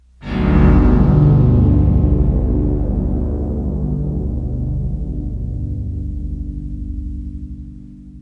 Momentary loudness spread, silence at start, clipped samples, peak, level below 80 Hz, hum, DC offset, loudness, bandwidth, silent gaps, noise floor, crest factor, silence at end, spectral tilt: 16 LU; 0.2 s; under 0.1%; 0 dBFS; -20 dBFS; 50 Hz at -30 dBFS; under 0.1%; -17 LUFS; 4.9 kHz; none; -35 dBFS; 14 dB; 0 s; -11 dB/octave